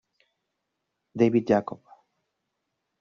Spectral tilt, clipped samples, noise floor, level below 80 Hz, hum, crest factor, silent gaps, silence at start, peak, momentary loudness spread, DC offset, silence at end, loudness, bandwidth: -7 dB/octave; under 0.1%; -81 dBFS; -66 dBFS; none; 22 dB; none; 1.15 s; -8 dBFS; 21 LU; under 0.1%; 1.25 s; -24 LUFS; 7 kHz